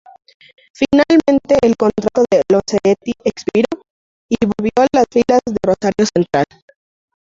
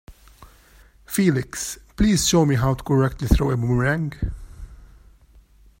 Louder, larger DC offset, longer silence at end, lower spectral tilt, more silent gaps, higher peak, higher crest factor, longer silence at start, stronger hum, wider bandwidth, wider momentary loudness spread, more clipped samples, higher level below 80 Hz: first, -15 LUFS vs -21 LUFS; neither; about the same, 0.95 s vs 0.95 s; about the same, -5.5 dB/octave vs -5.5 dB/octave; first, 3.90-4.29 s vs none; about the same, -2 dBFS vs -2 dBFS; second, 14 dB vs 20 dB; first, 0.8 s vs 0.1 s; neither; second, 7.8 kHz vs 16.5 kHz; second, 8 LU vs 12 LU; neither; second, -46 dBFS vs -32 dBFS